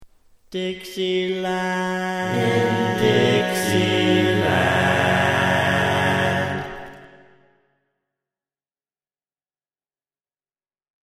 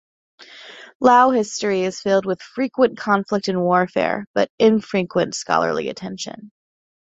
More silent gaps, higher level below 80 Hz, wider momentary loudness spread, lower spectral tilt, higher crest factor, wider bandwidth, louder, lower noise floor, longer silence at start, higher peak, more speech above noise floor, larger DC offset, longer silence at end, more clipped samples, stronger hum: second, none vs 0.95-1.00 s, 4.27-4.34 s, 4.50-4.58 s; first, -54 dBFS vs -62 dBFS; second, 10 LU vs 15 LU; about the same, -5 dB/octave vs -5 dB/octave; about the same, 18 dB vs 18 dB; first, 15.5 kHz vs 8.2 kHz; about the same, -20 LUFS vs -19 LUFS; first, under -90 dBFS vs -41 dBFS; second, 0 s vs 0.4 s; about the same, -4 dBFS vs -2 dBFS; first, over 70 dB vs 22 dB; neither; first, 4 s vs 0.65 s; neither; neither